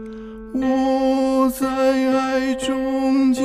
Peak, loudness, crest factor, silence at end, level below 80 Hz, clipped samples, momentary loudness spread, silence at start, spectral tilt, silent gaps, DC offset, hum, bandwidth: -6 dBFS; -19 LUFS; 12 dB; 0 s; -46 dBFS; under 0.1%; 6 LU; 0 s; -4.5 dB/octave; none; under 0.1%; none; 15 kHz